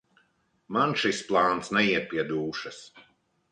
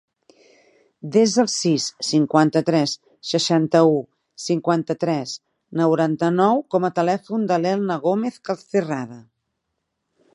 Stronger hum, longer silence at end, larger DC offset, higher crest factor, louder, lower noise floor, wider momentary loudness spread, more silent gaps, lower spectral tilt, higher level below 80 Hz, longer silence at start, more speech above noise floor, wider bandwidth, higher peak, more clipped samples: neither; second, 0.5 s vs 1.15 s; neither; about the same, 20 dB vs 20 dB; second, -26 LUFS vs -20 LUFS; second, -69 dBFS vs -77 dBFS; about the same, 12 LU vs 12 LU; neither; about the same, -4.5 dB/octave vs -5 dB/octave; about the same, -66 dBFS vs -70 dBFS; second, 0.7 s vs 1.05 s; second, 42 dB vs 57 dB; second, 10 kHz vs 11.5 kHz; second, -8 dBFS vs -2 dBFS; neither